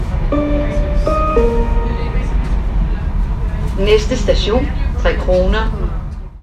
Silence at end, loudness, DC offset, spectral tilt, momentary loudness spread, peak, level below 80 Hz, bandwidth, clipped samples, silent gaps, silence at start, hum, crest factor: 0 s; -17 LUFS; under 0.1%; -6.5 dB/octave; 7 LU; 0 dBFS; -16 dBFS; 8 kHz; under 0.1%; none; 0 s; none; 14 dB